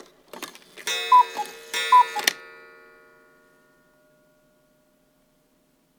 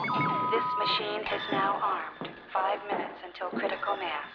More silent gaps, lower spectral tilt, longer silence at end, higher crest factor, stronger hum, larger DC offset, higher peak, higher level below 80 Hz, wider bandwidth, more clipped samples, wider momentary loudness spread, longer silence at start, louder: neither; second, 1 dB/octave vs -6.5 dB/octave; first, 3.55 s vs 0 s; first, 26 dB vs 16 dB; neither; neither; first, -2 dBFS vs -16 dBFS; second, -76 dBFS vs -70 dBFS; first, over 20 kHz vs 5.4 kHz; neither; first, 22 LU vs 9 LU; first, 0.35 s vs 0 s; first, -21 LUFS vs -30 LUFS